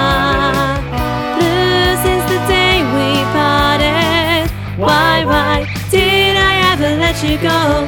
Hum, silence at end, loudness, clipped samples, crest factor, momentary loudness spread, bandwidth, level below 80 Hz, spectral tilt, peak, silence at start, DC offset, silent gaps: none; 0 s; -13 LUFS; under 0.1%; 10 dB; 6 LU; 19 kHz; -26 dBFS; -4.5 dB/octave; -2 dBFS; 0 s; under 0.1%; none